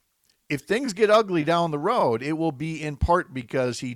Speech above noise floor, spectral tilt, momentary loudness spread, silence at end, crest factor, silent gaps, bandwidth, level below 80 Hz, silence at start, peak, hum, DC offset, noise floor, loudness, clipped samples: 45 dB; -5.5 dB/octave; 11 LU; 0 s; 16 dB; none; 15 kHz; -42 dBFS; 0.5 s; -8 dBFS; none; under 0.1%; -68 dBFS; -24 LUFS; under 0.1%